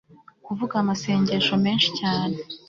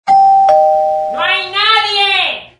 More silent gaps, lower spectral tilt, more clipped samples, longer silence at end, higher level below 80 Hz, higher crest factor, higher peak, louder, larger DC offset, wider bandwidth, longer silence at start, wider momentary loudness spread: neither; first, -5 dB/octave vs -1.5 dB/octave; neither; about the same, 0.1 s vs 0.15 s; second, -60 dBFS vs -54 dBFS; first, 18 dB vs 12 dB; second, -6 dBFS vs 0 dBFS; second, -23 LUFS vs -10 LUFS; neither; second, 7.4 kHz vs 10.5 kHz; first, 0.45 s vs 0.05 s; first, 9 LU vs 6 LU